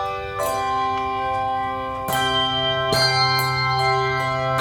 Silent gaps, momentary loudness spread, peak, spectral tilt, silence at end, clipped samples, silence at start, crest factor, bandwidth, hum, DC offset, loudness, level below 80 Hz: none; 7 LU; -6 dBFS; -3.5 dB/octave; 0 s; under 0.1%; 0 s; 14 dB; 18 kHz; none; under 0.1%; -21 LUFS; -46 dBFS